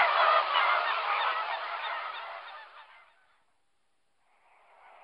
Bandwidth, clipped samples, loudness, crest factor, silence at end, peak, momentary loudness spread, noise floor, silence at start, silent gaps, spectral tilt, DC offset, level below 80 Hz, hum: 5.8 kHz; under 0.1%; -28 LUFS; 20 dB; 2.2 s; -12 dBFS; 20 LU; -79 dBFS; 0 s; none; -1 dB/octave; under 0.1%; -88 dBFS; none